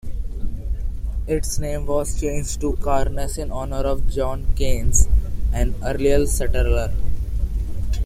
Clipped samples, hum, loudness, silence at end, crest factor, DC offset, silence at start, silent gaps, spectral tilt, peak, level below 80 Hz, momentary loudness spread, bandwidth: under 0.1%; none; -24 LUFS; 0 s; 16 dB; under 0.1%; 0.05 s; none; -5 dB/octave; -2 dBFS; -22 dBFS; 10 LU; 15 kHz